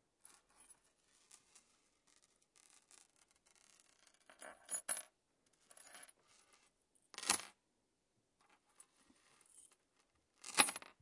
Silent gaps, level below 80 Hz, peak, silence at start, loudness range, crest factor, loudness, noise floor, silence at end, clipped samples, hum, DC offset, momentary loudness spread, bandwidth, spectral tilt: none; -90 dBFS; -10 dBFS; 4.4 s; 22 LU; 38 dB; -38 LUFS; -84 dBFS; 0.25 s; under 0.1%; none; under 0.1%; 30 LU; 12 kHz; 0.5 dB/octave